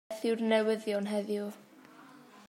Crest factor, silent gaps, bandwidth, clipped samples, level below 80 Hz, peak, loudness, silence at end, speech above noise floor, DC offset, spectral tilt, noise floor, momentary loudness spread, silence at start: 18 dB; none; 16 kHz; under 0.1%; -90 dBFS; -16 dBFS; -32 LUFS; 0.05 s; 24 dB; under 0.1%; -5.5 dB/octave; -55 dBFS; 12 LU; 0.1 s